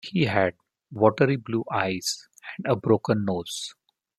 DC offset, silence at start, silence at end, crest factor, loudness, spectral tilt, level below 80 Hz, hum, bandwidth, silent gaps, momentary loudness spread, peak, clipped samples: under 0.1%; 0.05 s; 0.45 s; 22 dB; -25 LUFS; -5.5 dB/octave; -64 dBFS; none; 13 kHz; none; 12 LU; -4 dBFS; under 0.1%